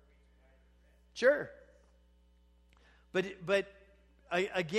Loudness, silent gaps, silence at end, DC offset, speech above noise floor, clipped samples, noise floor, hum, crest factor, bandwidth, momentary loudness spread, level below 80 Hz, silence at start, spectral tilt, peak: -33 LUFS; none; 0 s; under 0.1%; 34 dB; under 0.1%; -65 dBFS; 60 Hz at -65 dBFS; 22 dB; 13 kHz; 18 LU; -66 dBFS; 1.15 s; -4.5 dB/octave; -14 dBFS